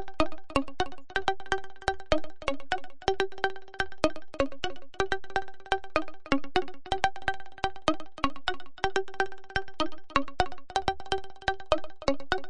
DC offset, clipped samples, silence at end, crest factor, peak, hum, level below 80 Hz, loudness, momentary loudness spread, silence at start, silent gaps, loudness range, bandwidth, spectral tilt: 2%; under 0.1%; 0 s; 24 dB; -6 dBFS; none; -46 dBFS; -32 LUFS; 6 LU; 0 s; none; 1 LU; 11.5 kHz; -4 dB/octave